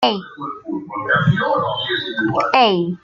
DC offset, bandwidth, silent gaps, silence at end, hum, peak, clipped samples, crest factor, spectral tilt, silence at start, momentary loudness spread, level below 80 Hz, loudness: under 0.1%; 7.2 kHz; none; 0.05 s; none; -2 dBFS; under 0.1%; 18 dB; -6.5 dB/octave; 0 s; 13 LU; -56 dBFS; -18 LUFS